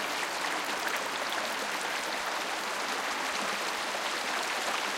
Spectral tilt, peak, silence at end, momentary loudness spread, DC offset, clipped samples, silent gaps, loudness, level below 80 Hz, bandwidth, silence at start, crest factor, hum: -0.5 dB/octave; -16 dBFS; 0 s; 1 LU; under 0.1%; under 0.1%; none; -31 LUFS; -72 dBFS; 16.5 kHz; 0 s; 16 dB; none